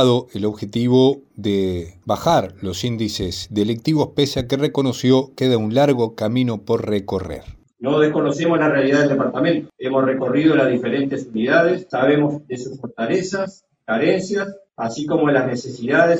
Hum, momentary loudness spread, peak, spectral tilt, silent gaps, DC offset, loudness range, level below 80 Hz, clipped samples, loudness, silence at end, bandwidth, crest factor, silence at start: none; 10 LU; -2 dBFS; -6 dB/octave; none; under 0.1%; 3 LU; -50 dBFS; under 0.1%; -19 LUFS; 0 s; 18 kHz; 18 dB; 0 s